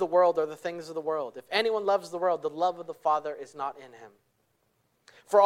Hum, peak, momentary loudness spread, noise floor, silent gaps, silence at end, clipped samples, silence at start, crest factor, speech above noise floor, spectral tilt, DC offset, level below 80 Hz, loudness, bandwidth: none; -8 dBFS; 11 LU; -72 dBFS; none; 0 s; under 0.1%; 0 s; 22 dB; 44 dB; -4 dB/octave; under 0.1%; -80 dBFS; -29 LUFS; 14.5 kHz